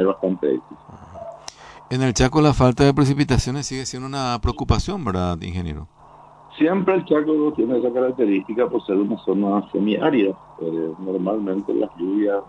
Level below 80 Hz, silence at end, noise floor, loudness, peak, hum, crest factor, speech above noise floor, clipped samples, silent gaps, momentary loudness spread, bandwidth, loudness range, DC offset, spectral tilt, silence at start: -36 dBFS; 0 s; -46 dBFS; -21 LUFS; -4 dBFS; none; 18 dB; 26 dB; under 0.1%; none; 12 LU; 11 kHz; 4 LU; under 0.1%; -6.5 dB/octave; 0 s